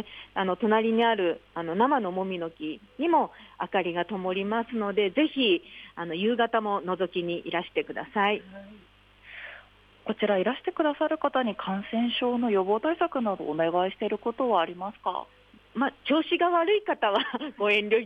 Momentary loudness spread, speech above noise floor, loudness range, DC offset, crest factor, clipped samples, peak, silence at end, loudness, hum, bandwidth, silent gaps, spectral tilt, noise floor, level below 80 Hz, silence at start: 11 LU; 27 dB; 3 LU; under 0.1%; 16 dB; under 0.1%; -10 dBFS; 0 s; -27 LUFS; 50 Hz at -60 dBFS; 5.6 kHz; none; -7 dB/octave; -54 dBFS; -66 dBFS; 0 s